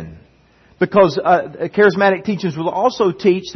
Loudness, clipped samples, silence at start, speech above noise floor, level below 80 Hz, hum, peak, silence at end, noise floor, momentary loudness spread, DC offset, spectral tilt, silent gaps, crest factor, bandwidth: -16 LUFS; under 0.1%; 0 s; 36 dB; -54 dBFS; none; 0 dBFS; 0 s; -52 dBFS; 9 LU; under 0.1%; -6.5 dB/octave; none; 16 dB; 6.4 kHz